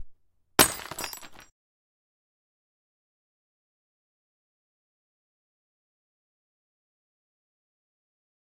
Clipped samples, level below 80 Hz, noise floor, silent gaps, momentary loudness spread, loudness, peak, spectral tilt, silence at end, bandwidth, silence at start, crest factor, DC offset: under 0.1%; -60 dBFS; -54 dBFS; none; 16 LU; -25 LUFS; 0 dBFS; -1.5 dB/octave; 7.05 s; 16 kHz; 0 s; 36 dB; under 0.1%